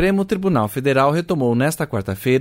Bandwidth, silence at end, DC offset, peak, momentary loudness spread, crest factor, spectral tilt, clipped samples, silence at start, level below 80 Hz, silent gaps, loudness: 16.5 kHz; 0 s; under 0.1%; -4 dBFS; 6 LU; 14 dB; -6.5 dB/octave; under 0.1%; 0 s; -48 dBFS; none; -19 LUFS